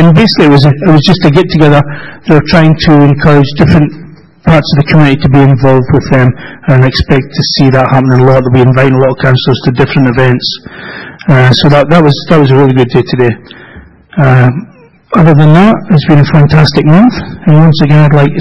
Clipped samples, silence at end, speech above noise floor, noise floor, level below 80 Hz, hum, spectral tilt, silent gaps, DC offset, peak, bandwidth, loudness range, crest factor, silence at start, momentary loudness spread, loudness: 6%; 0 s; 28 dB; -33 dBFS; -30 dBFS; none; -8 dB/octave; none; under 0.1%; 0 dBFS; 6.8 kHz; 2 LU; 6 dB; 0 s; 7 LU; -6 LUFS